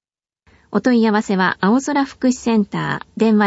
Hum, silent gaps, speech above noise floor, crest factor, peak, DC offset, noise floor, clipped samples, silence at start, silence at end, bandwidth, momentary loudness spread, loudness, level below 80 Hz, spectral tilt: none; none; 44 dB; 14 dB; -2 dBFS; under 0.1%; -60 dBFS; under 0.1%; 0.75 s; 0 s; 8 kHz; 7 LU; -18 LUFS; -56 dBFS; -5.5 dB/octave